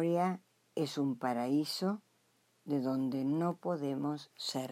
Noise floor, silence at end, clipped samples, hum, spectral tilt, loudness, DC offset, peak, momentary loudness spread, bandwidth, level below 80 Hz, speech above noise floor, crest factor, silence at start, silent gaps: -73 dBFS; 0 s; under 0.1%; none; -6 dB/octave; -36 LUFS; under 0.1%; -20 dBFS; 7 LU; 15.5 kHz; under -90 dBFS; 38 dB; 14 dB; 0 s; none